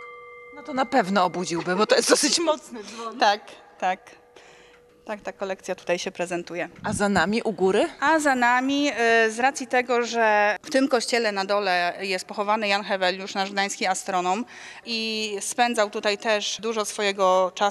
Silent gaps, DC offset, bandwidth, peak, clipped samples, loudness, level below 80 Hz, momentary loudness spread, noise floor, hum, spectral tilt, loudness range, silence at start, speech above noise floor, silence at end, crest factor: none; under 0.1%; 13.5 kHz; -2 dBFS; under 0.1%; -23 LUFS; -64 dBFS; 12 LU; -53 dBFS; none; -3 dB/octave; 7 LU; 0 s; 29 dB; 0 s; 22 dB